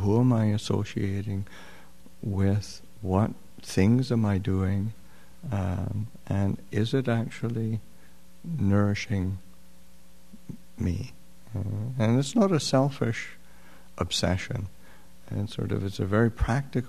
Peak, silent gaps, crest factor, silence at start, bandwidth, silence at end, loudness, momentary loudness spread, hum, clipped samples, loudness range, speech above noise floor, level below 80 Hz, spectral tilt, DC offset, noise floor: -8 dBFS; none; 20 dB; 0 s; 13.5 kHz; 0 s; -28 LUFS; 16 LU; none; under 0.1%; 4 LU; 30 dB; -48 dBFS; -6.5 dB/octave; 0.8%; -56 dBFS